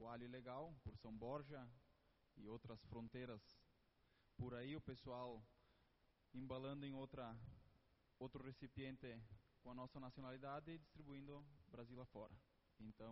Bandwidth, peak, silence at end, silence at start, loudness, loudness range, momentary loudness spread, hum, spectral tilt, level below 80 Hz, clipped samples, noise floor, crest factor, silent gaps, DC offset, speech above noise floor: 5.6 kHz; -38 dBFS; 0 s; 0 s; -57 LUFS; 3 LU; 10 LU; none; -6 dB/octave; -74 dBFS; under 0.1%; -80 dBFS; 20 dB; none; under 0.1%; 25 dB